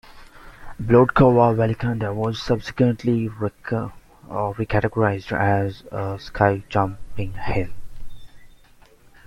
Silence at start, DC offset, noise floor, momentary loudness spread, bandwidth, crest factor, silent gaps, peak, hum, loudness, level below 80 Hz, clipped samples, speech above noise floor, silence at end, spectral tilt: 0.15 s; under 0.1%; -51 dBFS; 14 LU; 12 kHz; 20 dB; none; -2 dBFS; none; -21 LUFS; -42 dBFS; under 0.1%; 30 dB; 0.8 s; -8 dB/octave